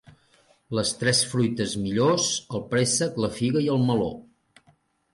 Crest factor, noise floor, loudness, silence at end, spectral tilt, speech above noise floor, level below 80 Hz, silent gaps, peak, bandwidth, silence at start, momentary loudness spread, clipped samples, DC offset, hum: 16 dB; -63 dBFS; -24 LUFS; 0.9 s; -4 dB/octave; 39 dB; -56 dBFS; none; -10 dBFS; 11.5 kHz; 0.7 s; 7 LU; under 0.1%; under 0.1%; none